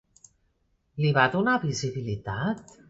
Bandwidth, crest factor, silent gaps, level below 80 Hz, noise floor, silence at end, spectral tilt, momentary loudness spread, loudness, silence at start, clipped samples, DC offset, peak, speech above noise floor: 8 kHz; 22 dB; none; -56 dBFS; -71 dBFS; 0.25 s; -5.5 dB/octave; 10 LU; -26 LUFS; 0.95 s; under 0.1%; under 0.1%; -6 dBFS; 45 dB